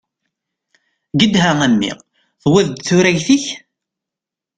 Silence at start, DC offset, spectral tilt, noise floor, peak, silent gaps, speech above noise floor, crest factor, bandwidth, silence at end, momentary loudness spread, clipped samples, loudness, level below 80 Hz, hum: 1.15 s; under 0.1%; -4.5 dB/octave; -86 dBFS; 0 dBFS; none; 72 dB; 16 dB; 9.4 kHz; 1 s; 12 LU; under 0.1%; -15 LUFS; -50 dBFS; none